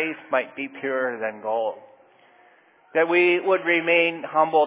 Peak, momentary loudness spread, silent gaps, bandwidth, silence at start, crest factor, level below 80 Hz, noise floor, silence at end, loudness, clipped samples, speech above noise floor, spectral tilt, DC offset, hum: -6 dBFS; 11 LU; none; 4 kHz; 0 s; 18 dB; -86 dBFS; -56 dBFS; 0 s; -22 LUFS; under 0.1%; 34 dB; -8 dB/octave; under 0.1%; none